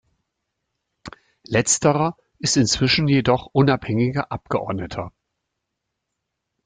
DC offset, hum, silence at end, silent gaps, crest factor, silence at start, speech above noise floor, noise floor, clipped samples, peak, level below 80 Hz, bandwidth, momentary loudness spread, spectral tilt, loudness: under 0.1%; none; 1.55 s; none; 18 dB; 1.05 s; 60 dB; -80 dBFS; under 0.1%; -4 dBFS; -50 dBFS; 9.6 kHz; 11 LU; -4.5 dB/octave; -20 LUFS